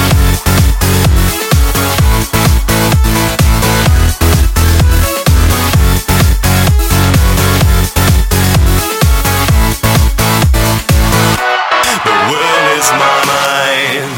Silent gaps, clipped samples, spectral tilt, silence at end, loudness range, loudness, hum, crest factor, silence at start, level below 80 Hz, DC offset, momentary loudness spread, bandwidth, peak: none; under 0.1%; -4.5 dB/octave; 0 s; 1 LU; -10 LUFS; none; 8 dB; 0 s; -14 dBFS; under 0.1%; 2 LU; 17.5 kHz; 0 dBFS